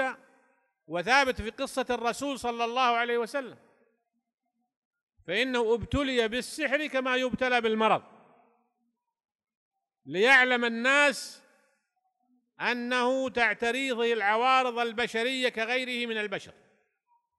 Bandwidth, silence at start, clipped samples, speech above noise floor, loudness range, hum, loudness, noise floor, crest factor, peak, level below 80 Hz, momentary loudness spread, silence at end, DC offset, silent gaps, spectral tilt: 12 kHz; 0 s; under 0.1%; 54 dB; 5 LU; none; -27 LUFS; -82 dBFS; 22 dB; -8 dBFS; -56 dBFS; 11 LU; 0.9 s; under 0.1%; 4.34-4.38 s, 4.76-4.91 s, 5.01-5.07 s, 9.35-9.39 s, 9.55-9.71 s; -3.5 dB/octave